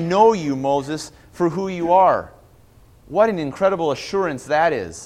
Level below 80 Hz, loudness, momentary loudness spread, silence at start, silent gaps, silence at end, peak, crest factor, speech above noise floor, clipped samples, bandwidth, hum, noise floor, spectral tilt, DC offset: -52 dBFS; -19 LUFS; 9 LU; 0 s; none; 0 s; -2 dBFS; 18 dB; 31 dB; under 0.1%; 14 kHz; none; -50 dBFS; -5.5 dB/octave; under 0.1%